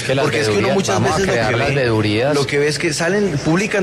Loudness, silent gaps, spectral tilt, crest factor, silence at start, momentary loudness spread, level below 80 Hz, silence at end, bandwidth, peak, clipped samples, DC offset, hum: -16 LUFS; none; -5 dB/octave; 12 dB; 0 s; 1 LU; -42 dBFS; 0 s; 13.5 kHz; -6 dBFS; under 0.1%; under 0.1%; none